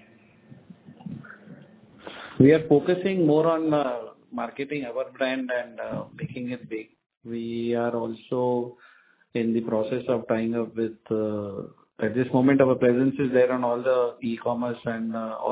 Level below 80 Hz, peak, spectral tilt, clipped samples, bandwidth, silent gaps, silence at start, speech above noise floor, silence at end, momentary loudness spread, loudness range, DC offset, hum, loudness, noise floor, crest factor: -64 dBFS; -4 dBFS; -11.5 dB/octave; under 0.1%; 4 kHz; 7.17-7.21 s; 0.5 s; 31 dB; 0 s; 17 LU; 7 LU; under 0.1%; none; -25 LUFS; -55 dBFS; 22 dB